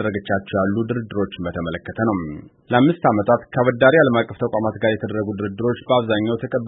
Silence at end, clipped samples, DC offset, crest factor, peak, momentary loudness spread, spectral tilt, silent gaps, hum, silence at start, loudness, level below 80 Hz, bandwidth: 0 s; under 0.1%; under 0.1%; 18 dB; -2 dBFS; 10 LU; -12 dB/octave; none; none; 0 s; -20 LUFS; -52 dBFS; 4 kHz